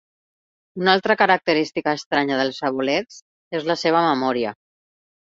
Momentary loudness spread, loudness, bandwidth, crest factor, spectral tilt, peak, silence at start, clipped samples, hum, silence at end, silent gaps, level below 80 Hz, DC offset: 10 LU; -20 LUFS; 7.8 kHz; 20 dB; -5 dB/octave; -2 dBFS; 0.75 s; under 0.1%; none; 0.65 s; 2.06-2.11 s, 3.22-3.51 s; -64 dBFS; under 0.1%